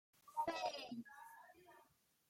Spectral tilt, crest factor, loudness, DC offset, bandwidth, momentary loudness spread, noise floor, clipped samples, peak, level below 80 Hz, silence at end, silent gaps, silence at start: -3 dB/octave; 18 dB; -46 LUFS; under 0.1%; 16.5 kHz; 22 LU; -75 dBFS; under 0.1%; -30 dBFS; -86 dBFS; 0.45 s; none; 0.25 s